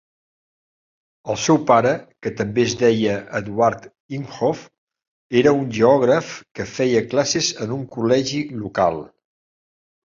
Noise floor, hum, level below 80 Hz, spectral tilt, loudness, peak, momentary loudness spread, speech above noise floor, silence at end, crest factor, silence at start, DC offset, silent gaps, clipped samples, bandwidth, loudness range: under -90 dBFS; none; -56 dBFS; -5 dB/octave; -19 LUFS; -2 dBFS; 15 LU; over 71 dB; 1 s; 18 dB; 1.25 s; under 0.1%; 4.00-4.09 s, 4.78-4.87 s, 5.08-5.30 s, 6.51-6.55 s; under 0.1%; 7.6 kHz; 2 LU